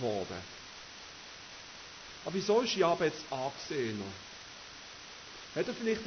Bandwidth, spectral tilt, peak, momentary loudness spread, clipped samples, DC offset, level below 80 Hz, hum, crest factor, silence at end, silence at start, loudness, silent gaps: 6.6 kHz; -4 dB/octave; -16 dBFS; 17 LU; under 0.1%; under 0.1%; -66 dBFS; none; 20 dB; 0 s; 0 s; -34 LUFS; none